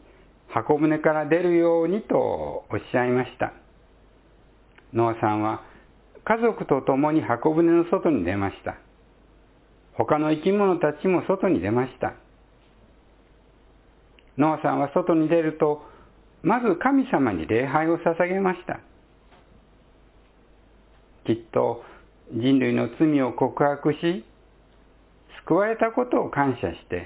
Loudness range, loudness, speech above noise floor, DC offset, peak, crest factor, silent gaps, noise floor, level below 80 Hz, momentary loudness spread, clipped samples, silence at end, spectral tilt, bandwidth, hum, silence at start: 6 LU; -23 LUFS; 33 dB; under 0.1%; -6 dBFS; 20 dB; none; -55 dBFS; -54 dBFS; 10 LU; under 0.1%; 0 s; -11 dB/octave; 4 kHz; none; 0.5 s